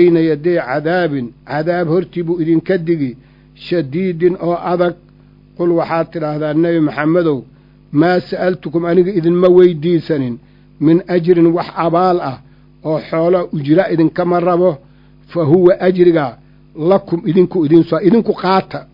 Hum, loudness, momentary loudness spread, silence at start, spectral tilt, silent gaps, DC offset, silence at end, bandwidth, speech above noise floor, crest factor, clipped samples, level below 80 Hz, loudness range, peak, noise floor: none; -14 LUFS; 9 LU; 0 s; -10 dB/octave; none; under 0.1%; 0.1 s; 5.4 kHz; 31 dB; 14 dB; under 0.1%; -50 dBFS; 4 LU; 0 dBFS; -44 dBFS